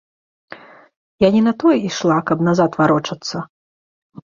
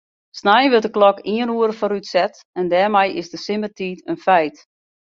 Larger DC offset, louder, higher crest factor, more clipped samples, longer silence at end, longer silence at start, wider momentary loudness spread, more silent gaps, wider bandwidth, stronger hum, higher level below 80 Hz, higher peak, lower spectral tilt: neither; about the same, -17 LUFS vs -18 LUFS; about the same, 16 dB vs 18 dB; neither; first, 0.8 s vs 0.65 s; first, 0.5 s vs 0.35 s; about the same, 12 LU vs 12 LU; first, 0.96-1.18 s vs 2.45-2.53 s; about the same, 7.4 kHz vs 7.6 kHz; neither; first, -54 dBFS vs -66 dBFS; about the same, -2 dBFS vs -2 dBFS; about the same, -6 dB/octave vs -5 dB/octave